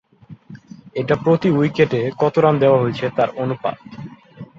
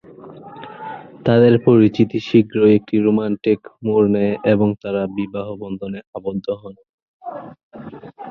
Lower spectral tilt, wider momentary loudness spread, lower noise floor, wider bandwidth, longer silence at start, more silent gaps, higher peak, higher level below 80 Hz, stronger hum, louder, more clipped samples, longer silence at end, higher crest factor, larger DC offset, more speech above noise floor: about the same, -8.5 dB/octave vs -9.5 dB/octave; second, 18 LU vs 23 LU; about the same, -42 dBFS vs -39 dBFS; first, 7.4 kHz vs 6.2 kHz; about the same, 0.3 s vs 0.25 s; second, none vs 6.07-6.13 s, 6.89-7.20 s, 7.63-7.71 s; about the same, -2 dBFS vs -2 dBFS; about the same, -56 dBFS vs -54 dBFS; neither; about the same, -18 LUFS vs -17 LUFS; neither; first, 0.15 s vs 0 s; about the same, 16 dB vs 16 dB; neither; first, 25 dB vs 21 dB